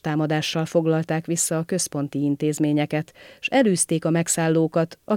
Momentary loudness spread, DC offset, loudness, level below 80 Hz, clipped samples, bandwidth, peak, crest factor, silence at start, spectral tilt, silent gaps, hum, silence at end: 6 LU; under 0.1%; -22 LUFS; -66 dBFS; under 0.1%; 16.5 kHz; -8 dBFS; 16 dB; 0.05 s; -5 dB/octave; none; none; 0 s